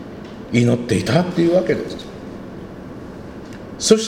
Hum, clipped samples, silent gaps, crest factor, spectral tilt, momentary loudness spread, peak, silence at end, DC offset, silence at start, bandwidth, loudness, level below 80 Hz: none; under 0.1%; none; 20 dB; -5.5 dB/octave; 18 LU; 0 dBFS; 0 s; under 0.1%; 0 s; 16 kHz; -18 LUFS; -46 dBFS